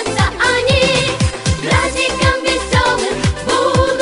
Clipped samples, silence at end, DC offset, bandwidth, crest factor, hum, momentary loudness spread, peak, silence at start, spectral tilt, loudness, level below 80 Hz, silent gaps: under 0.1%; 0 s; under 0.1%; 11 kHz; 14 dB; none; 5 LU; -2 dBFS; 0 s; -4 dB/octave; -14 LUFS; -28 dBFS; none